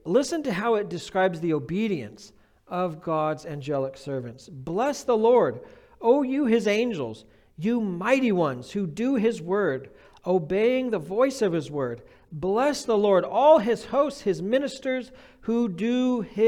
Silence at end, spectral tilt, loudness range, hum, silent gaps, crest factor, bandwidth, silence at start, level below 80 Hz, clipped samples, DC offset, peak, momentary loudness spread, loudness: 0 s; -6 dB/octave; 5 LU; none; none; 18 dB; 14 kHz; 0.05 s; -60 dBFS; under 0.1%; under 0.1%; -6 dBFS; 12 LU; -25 LUFS